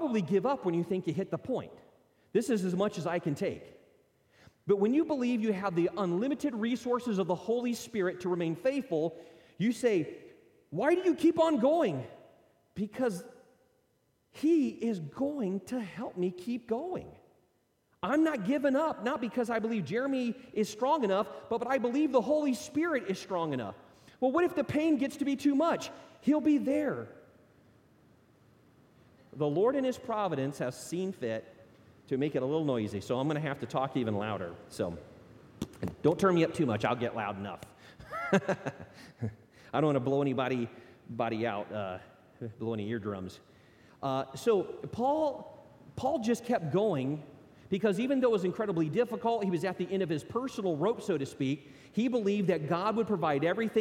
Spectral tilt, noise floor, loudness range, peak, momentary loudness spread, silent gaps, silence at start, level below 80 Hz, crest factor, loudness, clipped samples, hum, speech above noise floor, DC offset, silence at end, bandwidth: -6.5 dB/octave; -73 dBFS; 4 LU; -14 dBFS; 12 LU; none; 0 s; -68 dBFS; 18 dB; -32 LUFS; under 0.1%; none; 42 dB; under 0.1%; 0 s; 16.5 kHz